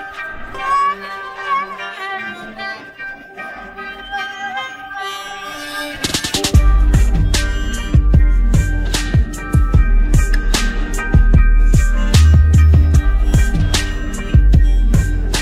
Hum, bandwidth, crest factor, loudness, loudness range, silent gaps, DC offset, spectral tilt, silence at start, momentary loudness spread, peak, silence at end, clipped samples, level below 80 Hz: none; 14.5 kHz; 14 dB; -16 LUFS; 12 LU; none; under 0.1%; -5 dB/octave; 0 s; 15 LU; 0 dBFS; 0 s; under 0.1%; -14 dBFS